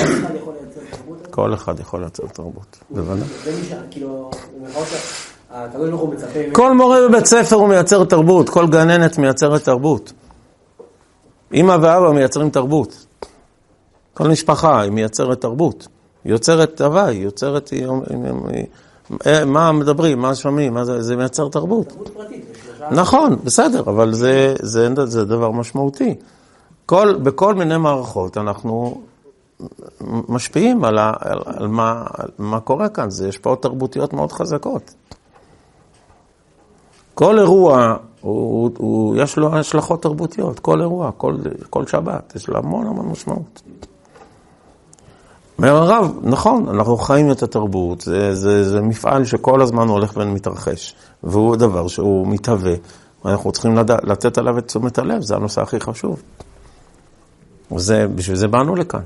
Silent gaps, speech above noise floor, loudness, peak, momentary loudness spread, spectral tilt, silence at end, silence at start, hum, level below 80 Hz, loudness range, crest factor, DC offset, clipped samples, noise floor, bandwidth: none; 39 dB; -16 LUFS; 0 dBFS; 17 LU; -5.5 dB/octave; 0 s; 0 s; none; -48 dBFS; 10 LU; 16 dB; under 0.1%; under 0.1%; -55 dBFS; 11.5 kHz